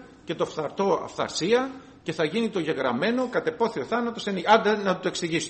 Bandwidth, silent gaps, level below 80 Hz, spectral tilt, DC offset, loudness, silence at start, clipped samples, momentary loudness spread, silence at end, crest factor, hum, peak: 8.8 kHz; none; -62 dBFS; -4.5 dB/octave; under 0.1%; -25 LUFS; 0 s; under 0.1%; 9 LU; 0 s; 20 dB; none; -6 dBFS